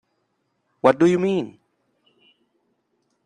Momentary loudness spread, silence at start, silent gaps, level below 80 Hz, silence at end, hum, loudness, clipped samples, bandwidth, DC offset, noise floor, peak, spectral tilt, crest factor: 11 LU; 0.85 s; none; -66 dBFS; 1.75 s; none; -19 LUFS; under 0.1%; 9.8 kHz; under 0.1%; -72 dBFS; -2 dBFS; -7 dB/octave; 22 dB